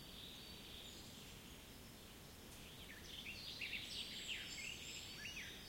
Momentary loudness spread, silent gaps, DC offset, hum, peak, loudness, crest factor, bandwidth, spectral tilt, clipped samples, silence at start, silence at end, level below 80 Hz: 11 LU; none; under 0.1%; none; -34 dBFS; -50 LUFS; 18 dB; 16.5 kHz; -2 dB/octave; under 0.1%; 0 s; 0 s; -66 dBFS